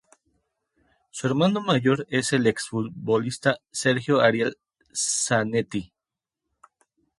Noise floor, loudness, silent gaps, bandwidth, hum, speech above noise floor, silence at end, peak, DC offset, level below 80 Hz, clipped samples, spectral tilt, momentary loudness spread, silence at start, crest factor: -88 dBFS; -24 LUFS; none; 11.5 kHz; none; 65 dB; 1.35 s; -4 dBFS; under 0.1%; -64 dBFS; under 0.1%; -4.5 dB/octave; 9 LU; 1.15 s; 22 dB